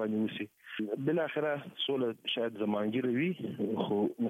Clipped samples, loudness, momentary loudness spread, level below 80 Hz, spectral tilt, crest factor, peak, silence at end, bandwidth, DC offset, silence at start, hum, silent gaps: under 0.1%; -33 LUFS; 5 LU; -80 dBFS; -7.5 dB/octave; 14 dB; -18 dBFS; 0 s; 15 kHz; under 0.1%; 0 s; none; none